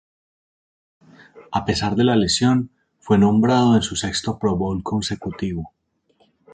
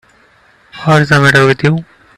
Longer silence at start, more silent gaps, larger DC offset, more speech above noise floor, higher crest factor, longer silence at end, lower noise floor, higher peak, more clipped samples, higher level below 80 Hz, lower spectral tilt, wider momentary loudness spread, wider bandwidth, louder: first, 1.35 s vs 0.75 s; neither; neither; first, 43 dB vs 39 dB; about the same, 16 dB vs 12 dB; first, 0.85 s vs 0.35 s; first, -62 dBFS vs -48 dBFS; second, -4 dBFS vs 0 dBFS; neither; about the same, -44 dBFS vs -44 dBFS; about the same, -5.5 dB/octave vs -6 dB/octave; about the same, 12 LU vs 11 LU; second, 9.4 kHz vs 13 kHz; second, -20 LUFS vs -10 LUFS